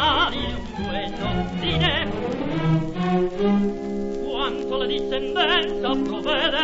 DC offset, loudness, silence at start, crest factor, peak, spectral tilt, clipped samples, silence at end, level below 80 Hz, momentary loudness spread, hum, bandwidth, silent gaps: under 0.1%; -23 LUFS; 0 s; 16 dB; -6 dBFS; -6.5 dB/octave; under 0.1%; 0 s; -38 dBFS; 8 LU; none; 8 kHz; none